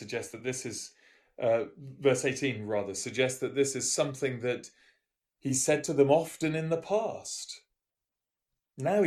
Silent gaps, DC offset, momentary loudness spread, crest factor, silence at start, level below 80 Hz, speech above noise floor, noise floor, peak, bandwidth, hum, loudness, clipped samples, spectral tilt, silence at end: none; under 0.1%; 12 LU; 20 dB; 0 s; -70 dBFS; 59 dB; -89 dBFS; -10 dBFS; 13.5 kHz; none; -30 LUFS; under 0.1%; -4 dB/octave; 0 s